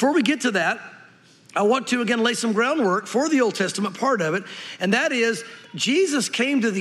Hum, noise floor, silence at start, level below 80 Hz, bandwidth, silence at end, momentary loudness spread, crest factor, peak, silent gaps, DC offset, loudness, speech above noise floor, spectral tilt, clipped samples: none; -51 dBFS; 0 s; -80 dBFS; 14 kHz; 0 s; 7 LU; 16 dB; -6 dBFS; none; under 0.1%; -22 LUFS; 30 dB; -3.5 dB/octave; under 0.1%